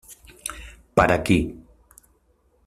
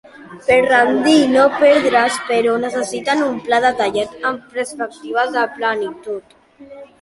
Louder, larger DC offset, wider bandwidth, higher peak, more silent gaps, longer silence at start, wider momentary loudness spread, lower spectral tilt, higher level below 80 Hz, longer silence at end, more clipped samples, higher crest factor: second, -23 LUFS vs -16 LUFS; neither; first, 15 kHz vs 11.5 kHz; about the same, -2 dBFS vs -2 dBFS; neither; about the same, 0.1 s vs 0.15 s; first, 16 LU vs 13 LU; first, -5.5 dB/octave vs -3.5 dB/octave; first, -42 dBFS vs -56 dBFS; first, 1.05 s vs 0.15 s; neither; first, 22 dB vs 16 dB